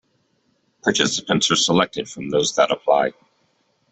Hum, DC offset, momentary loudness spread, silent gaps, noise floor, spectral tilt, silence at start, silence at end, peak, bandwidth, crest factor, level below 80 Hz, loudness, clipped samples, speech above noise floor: none; under 0.1%; 8 LU; none; -66 dBFS; -3 dB/octave; 0.85 s; 0.8 s; -4 dBFS; 8.4 kHz; 18 dB; -60 dBFS; -19 LUFS; under 0.1%; 46 dB